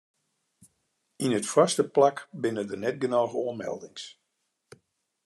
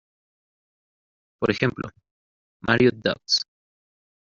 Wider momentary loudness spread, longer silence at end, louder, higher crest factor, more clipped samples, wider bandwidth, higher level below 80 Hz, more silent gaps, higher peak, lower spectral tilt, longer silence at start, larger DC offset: about the same, 15 LU vs 17 LU; first, 1.15 s vs 0.9 s; second, -27 LUFS vs -23 LUFS; about the same, 22 dB vs 24 dB; neither; first, 13 kHz vs 7.4 kHz; second, -80 dBFS vs -56 dBFS; second, none vs 2.11-2.60 s; second, -8 dBFS vs -4 dBFS; about the same, -4.5 dB/octave vs -3.5 dB/octave; second, 1.2 s vs 1.4 s; neither